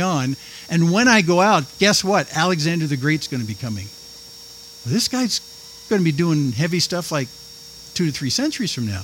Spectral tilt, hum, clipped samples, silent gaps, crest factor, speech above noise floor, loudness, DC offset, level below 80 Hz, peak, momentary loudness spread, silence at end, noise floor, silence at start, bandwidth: -4.5 dB/octave; none; under 0.1%; none; 20 dB; 21 dB; -19 LUFS; under 0.1%; -56 dBFS; -2 dBFS; 22 LU; 0 s; -40 dBFS; 0 s; 17 kHz